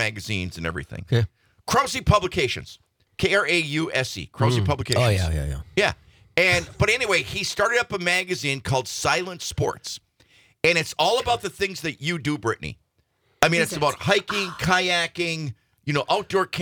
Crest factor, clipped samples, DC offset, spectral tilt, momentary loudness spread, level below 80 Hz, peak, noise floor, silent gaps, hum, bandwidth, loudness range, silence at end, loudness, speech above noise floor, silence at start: 22 dB; under 0.1%; under 0.1%; -4 dB/octave; 10 LU; -44 dBFS; -2 dBFS; -68 dBFS; none; none; 19.5 kHz; 3 LU; 0 s; -23 LUFS; 45 dB; 0 s